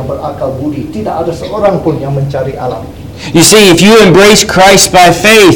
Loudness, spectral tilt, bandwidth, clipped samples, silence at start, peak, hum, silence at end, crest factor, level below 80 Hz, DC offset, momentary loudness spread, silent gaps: -6 LUFS; -3.5 dB/octave; over 20 kHz; 5%; 0 s; 0 dBFS; none; 0 s; 6 dB; -32 dBFS; 0.8%; 15 LU; none